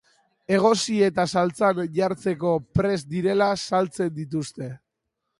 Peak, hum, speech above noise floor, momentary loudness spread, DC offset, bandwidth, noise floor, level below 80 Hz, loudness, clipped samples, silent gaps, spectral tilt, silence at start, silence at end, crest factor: -6 dBFS; none; 57 dB; 9 LU; under 0.1%; 11.5 kHz; -80 dBFS; -52 dBFS; -23 LUFS; under 0.1%; none; -5.5 dB/octave; 0.5 s; 0.65 s; 18 dB